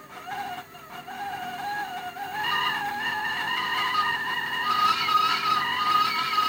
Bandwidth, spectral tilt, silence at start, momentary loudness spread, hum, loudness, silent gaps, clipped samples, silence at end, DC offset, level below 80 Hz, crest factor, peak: 17 kHz; -1.5 dB/octave; 0 s; 14 LU; none; -25 LUFS; none; under 0.1%; 0 s; under 0.1%; -66 dBFS; 16 dB; -12 dBFS